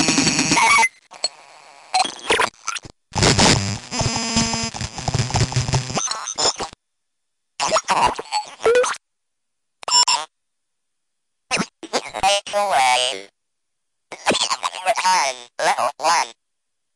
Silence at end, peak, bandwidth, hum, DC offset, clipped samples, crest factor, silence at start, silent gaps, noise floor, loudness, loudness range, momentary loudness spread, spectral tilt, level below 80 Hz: 0.65 s; -4 dBFS; 11.5 kHz; none; under 0.1%; under 0.1%; 18 dB; 0 s; none; -81 dBFS; -19 LUFS; 3 LU; 12 LU; -2.5 dB/octave; -44 dBFS